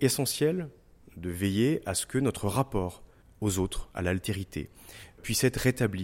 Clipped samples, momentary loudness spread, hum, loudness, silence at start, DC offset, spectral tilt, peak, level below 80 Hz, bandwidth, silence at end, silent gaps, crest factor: under 0.1%; 14 LU; none; -30 LUFS; 0 s; under 0.1%; -5 dB/octave; -12 dBFS; -48 dBFS; 16.5 kHz; 0 s; none; 18 dB